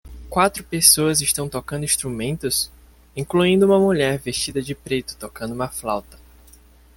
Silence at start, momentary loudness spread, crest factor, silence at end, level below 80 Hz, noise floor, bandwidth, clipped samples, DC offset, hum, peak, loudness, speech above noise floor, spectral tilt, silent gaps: 0.05 s; 14 LU; 22 dB; 0.8 s; -46 dBFS; -49 dBFS; 17 kHz; under 0.1%; under 0.1%; none; 0 dBFS; -20 LUFS; 29 dB; -3.5 dB/octave; none